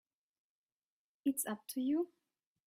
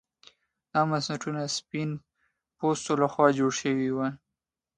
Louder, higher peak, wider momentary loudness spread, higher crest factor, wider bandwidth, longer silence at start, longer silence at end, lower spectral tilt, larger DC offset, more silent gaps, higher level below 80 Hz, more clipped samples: second, -38 LUFS vs -28 LUFS; second, -24 dBFS vs -6 dBFS; second, 4 LU vs 10 LU; about the same, 18 dB vs 22 dB; first, 16 kHz vs 11 kHz; first, 1.25 s vs 0.75 s; about the same, 0.6 s vs 0.6 s; second, -3.5 dB/octave vs -5 dB/octave; neither; neither; second, -86 dBFS vs -68 dBFS; neither